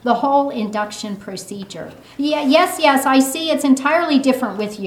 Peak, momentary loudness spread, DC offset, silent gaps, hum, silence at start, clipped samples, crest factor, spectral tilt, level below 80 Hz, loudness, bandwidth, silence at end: 0 dBFS; 16 LU; under 0.1%; none; none; 0.05 s; under 0.1%; 16 dB; -3.5 dB/octave; -60 dBFS; -16 LUFS; 16.5 kHz; 0 s